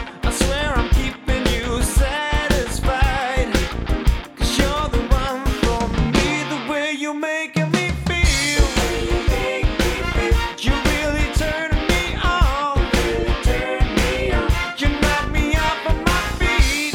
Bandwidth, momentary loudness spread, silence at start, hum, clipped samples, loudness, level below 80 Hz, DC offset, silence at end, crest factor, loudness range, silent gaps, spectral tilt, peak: 16.5 kHz; 4 LU; 0 s; none; under 0.1%; -20 LUFS; -22 dBFS; under 0.1%; 0 s; 18 dB; 1 LU; none; -4.5 dB/octave; -2 dBFS